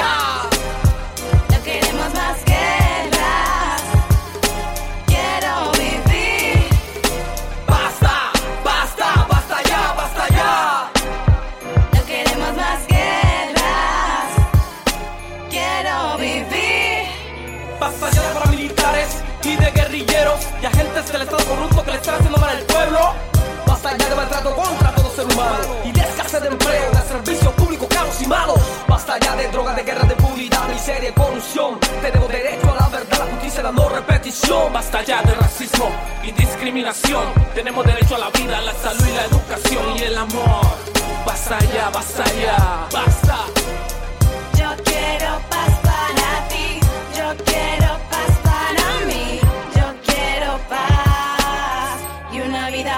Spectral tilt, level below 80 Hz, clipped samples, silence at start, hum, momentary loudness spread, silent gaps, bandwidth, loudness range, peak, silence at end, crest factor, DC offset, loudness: -4.5 dB/octave; -22 dBFS; under 0.1%; 0 s; none; 6 LU; none; 17 kHz; 1 LU; -2 dBFS; 0 s; 14 dB; under 0.1%; -17 LUFS